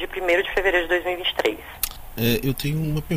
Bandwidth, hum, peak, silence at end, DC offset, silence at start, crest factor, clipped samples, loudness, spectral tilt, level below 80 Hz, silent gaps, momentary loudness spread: 16 kHz; none; -6 dBFS; 0 s; under 0.1%; 0 s; 16 dB; under 0.1%; -23 LUFS; -4.5 dB/octave; -38 dBFS; none; 8 LU